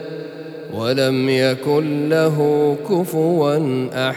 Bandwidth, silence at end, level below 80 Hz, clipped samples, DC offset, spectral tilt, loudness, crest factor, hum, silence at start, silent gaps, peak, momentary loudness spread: 19.5 kHz; 0 s; -72 dBFS; under 0.1%; under 0.1%; -6.5 dB/octave; -18 LUFS; 14 dB; none; 0 s; none; -4 dBFS; 13 LU